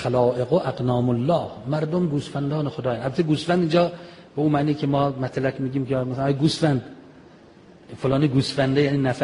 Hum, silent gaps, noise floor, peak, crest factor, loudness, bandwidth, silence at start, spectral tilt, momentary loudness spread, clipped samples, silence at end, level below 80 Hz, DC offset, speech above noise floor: none; none; -49 dBFS; -6 dBFS; 16 dB; -23 LUFS; 10.5 kHz; 0 s; -7 dB/octave; 6 LU; under 0.1%; 0 s; -52 dBFS; under 0.1%; 27 dB